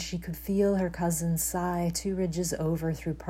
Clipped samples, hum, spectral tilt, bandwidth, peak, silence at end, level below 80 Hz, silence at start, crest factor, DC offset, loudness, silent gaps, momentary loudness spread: under 0.1%; none; -5.5 dB/octave; 16 kHz; -14 dBFS; 0 s; -46 dBFS; 0 s; 14 dB; under 0.1%; -29 LUFS; none; 5 LU